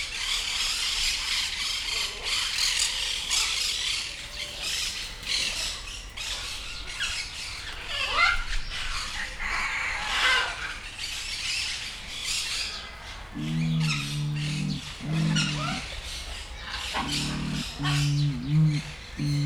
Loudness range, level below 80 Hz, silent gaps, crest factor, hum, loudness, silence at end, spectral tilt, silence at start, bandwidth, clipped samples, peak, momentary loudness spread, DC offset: 4 LU; -42 dBFS; none; 20 dB; none; -27 LUFS; 0 s; -2.5 dB/octave; 0 s; 17 kHz; under 0.1%; -10 dBFS; 11 LU; under 0.1%